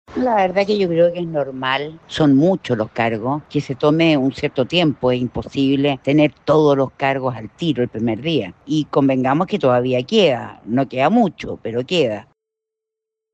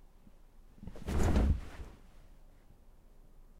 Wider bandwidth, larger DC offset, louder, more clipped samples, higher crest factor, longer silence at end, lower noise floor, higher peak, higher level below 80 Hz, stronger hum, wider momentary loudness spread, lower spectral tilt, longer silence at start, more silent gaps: second, 8.4 kHz vs 14.5 kHz; neither; first, -18 LUFS vs -34 LUFS; neither; second, 14 dB vs 20 dB; first, 1.1 s vs 0.2 s; first, -83 dBFS vs -58 dBFS; first, -4 dBFS vs -16 dBFS; second, -52 dBFS vs -40 dBFS; neither; second, 8 LU vs 22 LU; about the same, -7 dB/octave vs -7 dB/octave; second, 0.1 s vs 0.8 s; neither